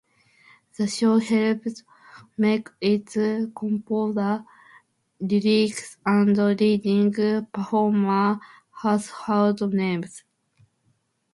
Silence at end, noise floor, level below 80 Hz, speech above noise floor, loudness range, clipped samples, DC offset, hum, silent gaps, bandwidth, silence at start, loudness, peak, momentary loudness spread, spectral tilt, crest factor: 1.15 s; -69 dBFS; -68 dBFS; 46 dB; 4 LU; under 0.1%; under 0.1%; none; none; 11.5 kHz; 0.8 s; -23 LUFS; -8 dBFS; 9 LU; -6.5 dB/octave; 14 dB